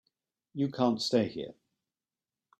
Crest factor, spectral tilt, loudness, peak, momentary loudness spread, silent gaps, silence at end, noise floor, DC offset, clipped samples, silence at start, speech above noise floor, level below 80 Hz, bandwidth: 22 dB; -5.5 dB/octave; -30 LUFS; -12 dBFS; 16 LU; none; 1.05 s; under -90 dBFS; under 0.1%; under 0.1%; 0.55 s; over 60 dB; -74 dBFS; 12.5 kHz